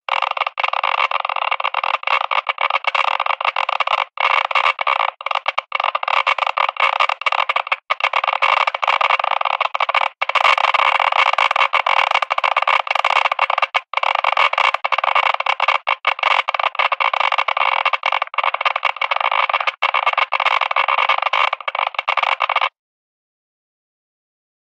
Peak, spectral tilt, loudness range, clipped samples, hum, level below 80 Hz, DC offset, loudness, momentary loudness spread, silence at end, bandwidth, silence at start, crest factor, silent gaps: 0 dBFS; 2.5 dB/octave; 3 LU; under 0.1%; none; -80 dBFS; under 0.1%; -17 LUFS; 5 LU; 2.1 s; 9.6 kHz; 0.1 s; 18 dB; none